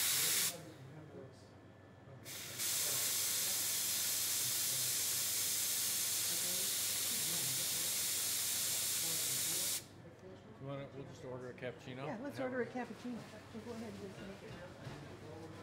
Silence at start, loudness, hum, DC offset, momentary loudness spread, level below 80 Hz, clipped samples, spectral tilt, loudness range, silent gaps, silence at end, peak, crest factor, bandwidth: 0 s; -35 LUFS; none; under 0.1%; 18 LU; -76 dBFS; under 0.1%; -1 dB/octave; 12 LU; none; 0 s; -22 dBFS; 18 dB; 16 kHz